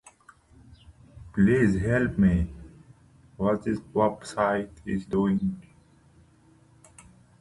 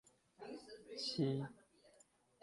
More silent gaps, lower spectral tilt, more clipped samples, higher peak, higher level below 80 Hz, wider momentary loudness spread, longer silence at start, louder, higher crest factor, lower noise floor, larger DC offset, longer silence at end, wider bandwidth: neither; first, -8 dB/octave vs -6 dB/octave; neither; first, -10 dBFS vs -26 dBFS; first, -44 dBFS vs -78 dBFS; second, 11 LU vs 15 LU; first, 1.15 s vs 0.4 s; first, -26 LUFS vs -44 LUFS; about the same, 18 dB vs 20 dB; second, -58 dBFS vs -72 dBFS; neither; first, 1.8 s vs 0.55 s; about the same, 11.5 kHz vs 11.5 kHz